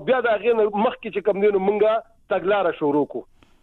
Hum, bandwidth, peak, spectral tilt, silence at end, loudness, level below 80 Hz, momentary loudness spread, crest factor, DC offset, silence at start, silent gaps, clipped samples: none; 4.2 kHz; -8 dBFS; -8.5 dB/octave; 0.4 s; -21 LUFS; -58 dBFS; 7 LU; 12 dB; under 0.1%; 0 s; none; under 0.1%